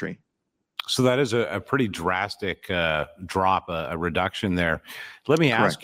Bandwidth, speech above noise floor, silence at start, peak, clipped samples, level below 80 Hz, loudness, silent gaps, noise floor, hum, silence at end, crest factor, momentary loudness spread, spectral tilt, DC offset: 16.5 kHz; 55 dB; 0 s; -6 dBFS; under 0.1%; -54 dBFS; -24 LUFS; none; -79 dBFS; none; 0 s; 20 dB; 13 LU; -5 dB/octave; under 0.1%